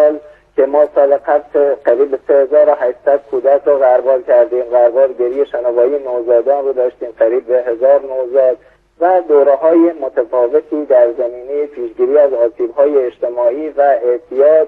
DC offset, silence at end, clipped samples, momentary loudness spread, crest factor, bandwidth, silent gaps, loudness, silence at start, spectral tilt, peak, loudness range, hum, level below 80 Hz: under 0.1%; 0 s; under 0.1%; 7 LU; 12 dB; 3.7 kHz; none; -13 LUFS; 0 s; -7.5 dB/octave; 0 dBFS; 2 LU; none; -58 dBFS